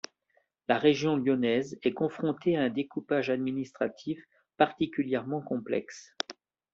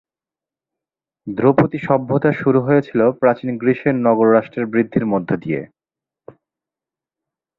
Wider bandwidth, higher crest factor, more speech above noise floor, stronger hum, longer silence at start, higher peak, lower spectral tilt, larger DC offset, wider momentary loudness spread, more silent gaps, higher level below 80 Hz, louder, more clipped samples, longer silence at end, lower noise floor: first, 7.6 kHz vs 5.2 kHz; about the same, 22 dB vs 18 dB; second, 44 dB vs 73 dB; neither; second, 0.7 s vs 1.25 s; second, -8 dBFS vs -2 dBFS; second, -4.5 dB/octave vs -10.5 dB/octave; neither; first, 12 LU vs 7 LU; neither; second, -70 dBFS vs -56 dBFS; second, -30 LUFS vs -17 LUFS; neither; second, 0.4 s vs 1.95 s; second, -73 dBFS vs -89 dBFS